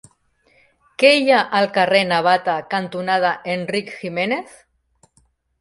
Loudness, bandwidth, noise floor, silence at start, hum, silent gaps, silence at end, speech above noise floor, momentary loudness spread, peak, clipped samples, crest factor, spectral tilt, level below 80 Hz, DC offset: -18 LUFS; 11.5 kHz; -61 dBFS; 1 s; none; none; 1.2 s; 43 dB; 11 LU; 0 dBFS; under 0.1%; 20 dB; -4.5 dB/octave; -64 dBFS; under 0.1%